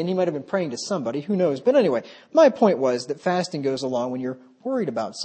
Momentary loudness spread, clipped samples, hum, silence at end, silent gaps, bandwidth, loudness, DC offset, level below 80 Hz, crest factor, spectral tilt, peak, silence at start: 10 LU; under 0.1%; none; 0 s; none; 8.8 kHz; -23 LUFS; under 0.1%; -74 dBFS; 18 dB; -5.5 dB/octave; -4 dBFS; 0 s